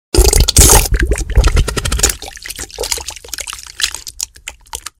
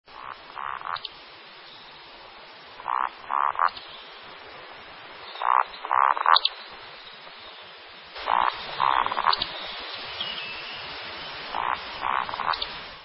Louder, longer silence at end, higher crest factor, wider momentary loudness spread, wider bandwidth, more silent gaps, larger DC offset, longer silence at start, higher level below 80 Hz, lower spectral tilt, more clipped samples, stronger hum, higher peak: first, -13 LUFS vs -26 LUFS; first, 0.2 s vs 0 s; second, 14 dB vs 26 dB; about the same, 19 LU vs 20 LU; first, over 20 kHz vs 5.8 kHz; neither; neither; about the same, 0.15 s vs 0.1 s; first, -16 dBFS vs -60 dBFS; second, -2.5 dB/octave vs -5.5 dB/octave; first, 0.3% vs under 0.1%; neither; about the same, 0 dBFS vs -2 dBFS